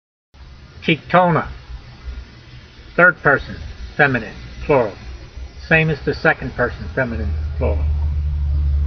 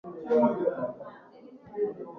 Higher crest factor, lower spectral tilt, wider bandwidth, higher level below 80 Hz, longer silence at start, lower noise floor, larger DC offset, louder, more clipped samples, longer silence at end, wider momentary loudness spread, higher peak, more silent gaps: about the same, 20 dB vs 18 dB; second, -5 dB/octave vs -9.5 dB/octave; about the same, 6.2 kHz vs 6 kHz; first, -26 dBFS vs -72 dBFS; first, 0.4 s vs 0.05 s; second, -40 dBFS vs -51 dBFS; neither; first, -18 LUFS vs -28 LUFS; neither; about the same, 0 s vs 0 s; about the same, 21 LU vs 19 LU; first, 0 dBFS vs -12 dBFS; neither